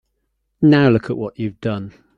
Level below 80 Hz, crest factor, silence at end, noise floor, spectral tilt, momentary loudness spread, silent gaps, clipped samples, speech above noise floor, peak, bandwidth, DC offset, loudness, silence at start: -52 dBFS; 16 dB; 0.25 s; -71 dBFS; -9 dB/octave; 13 LU; none; under 0.1%; 54 dB; -2 dBFS; 5.6 kHz; under 0.1%; -17 LUFS; 0.6 s